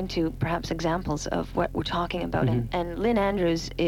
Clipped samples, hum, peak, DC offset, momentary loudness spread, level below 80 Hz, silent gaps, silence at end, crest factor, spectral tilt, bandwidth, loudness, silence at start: under 0.1%; none; -14 dBFS; 0.1%; 5 LU; -40 dBFS; none; 0 s; 14 dB; -6 dB/octave; 17 kHz; -27 LUFS; 0 s